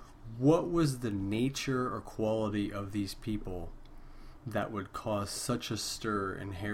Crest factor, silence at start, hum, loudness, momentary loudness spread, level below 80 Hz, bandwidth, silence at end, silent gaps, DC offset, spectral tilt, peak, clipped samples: 20 dB; 0 s; none; -34 LUFS; 11 LU; -50 dBFS; 16.5 kHz; 0 s; none; under 0.1%; -5.5 dB/octave; -14 dBFS; under 0.1%